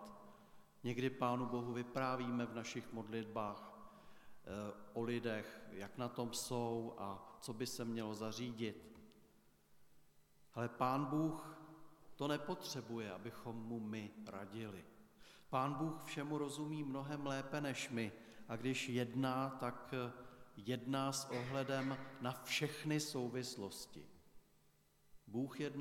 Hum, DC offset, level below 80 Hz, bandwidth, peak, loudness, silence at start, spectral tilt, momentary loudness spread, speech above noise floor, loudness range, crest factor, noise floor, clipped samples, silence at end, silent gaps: none; under 0.1%; -76 dBFS; 17.5 kHz; -24 dBFS; -44 LUFS; 0 s; -5 dB/octave; 15 LU; 30 dB; 5 LU; 20 dB; -73 dBFS; under 0.1%; 0 s; none